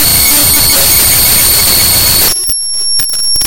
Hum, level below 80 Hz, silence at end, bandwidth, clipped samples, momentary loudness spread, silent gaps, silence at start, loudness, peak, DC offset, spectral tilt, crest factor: none; -26 dBFS; 0 s; over 20 kHz; 0.8%; 6 LU; none; 0 s; -5 LUFS; 0 dBFS; under 0.1%; -0.5 dB/octave; 8 dB